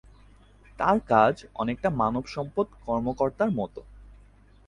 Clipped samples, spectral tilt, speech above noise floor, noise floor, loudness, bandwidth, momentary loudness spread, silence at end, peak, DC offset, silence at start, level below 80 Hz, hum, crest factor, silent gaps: under 0.1%; -7.5 dB/octave; 29 dB; -54 dBFS; -26 LUFS; 10.5 kHz; 10 LU; 0.55 s; -6 dBFS; under 0.1%; 0.8 s; -50 dBFS; none; 22 dB; none